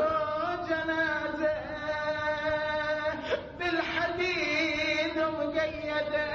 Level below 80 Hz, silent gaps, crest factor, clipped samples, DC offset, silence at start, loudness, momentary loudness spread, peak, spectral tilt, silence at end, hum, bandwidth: -54 dBFS; none; 14 dB; under 0.1%; under 0.1%; 0 s; -30 LUFS; 5 LU; -16 dBFS; -4.5 dB/octave; 0 s; none; 7.2 kHz